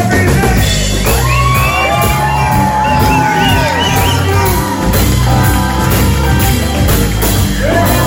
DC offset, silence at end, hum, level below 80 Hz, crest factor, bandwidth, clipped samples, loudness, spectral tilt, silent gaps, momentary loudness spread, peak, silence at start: 0.2%; 0 s; none; -18 dBFS; 10 dB; 17 kHz; under 0.1%; -11 LUFS; -4.5 dB/octave; none; 2 LU; 0 dBFS; 0 s